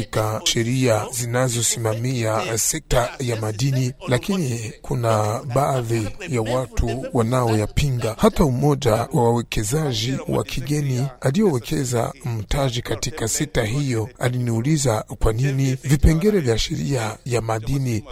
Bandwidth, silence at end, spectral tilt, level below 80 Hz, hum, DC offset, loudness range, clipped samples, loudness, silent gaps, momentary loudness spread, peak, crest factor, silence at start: 16 kHz; 0 s; -5 dB/octave; -32 dBFS; none; under 0.1%; 2 LU; under 0.1%; -21 LUFS; none; 6 LU; -4 dBFS; 18 dB; 0 s